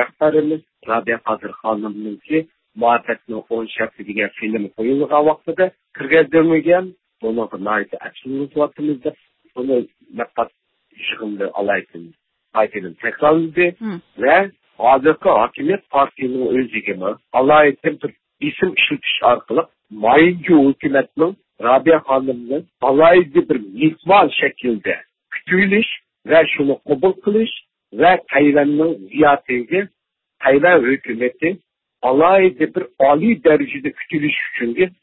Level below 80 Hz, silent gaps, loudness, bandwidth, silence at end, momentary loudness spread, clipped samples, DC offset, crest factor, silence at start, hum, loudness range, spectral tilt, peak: -56 dBFS; none; -17 LUFS; 4.2 kHz; 0.15 s; 13 LU; under 0.1%; under 0.1%; 16 dB; 0 s; none; 8 LU; -11 dB/octave; -2 dBFS